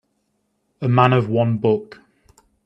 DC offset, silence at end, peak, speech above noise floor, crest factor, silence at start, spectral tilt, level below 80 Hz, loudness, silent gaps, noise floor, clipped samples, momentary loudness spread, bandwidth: under 0.1%; 0.8 s; 0 dBFS; 53 dB; 20 dB; 0.8 s; -9 dB/octave; -58 dBFS; -18 LUFS; none; -70 dBFS; under 0.1%; 8 LU; 5.6 kHz